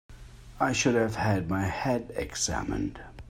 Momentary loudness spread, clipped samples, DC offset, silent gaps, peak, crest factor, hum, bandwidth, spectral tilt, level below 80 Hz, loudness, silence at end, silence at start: 8 LU; under 0.1%; under 0.1%; none; -12 dBFS; 18 dB; none; 16 kHz; -4.5 dB/octave; -46 dBFS; -29 LUFS; 0 s; 0.1 s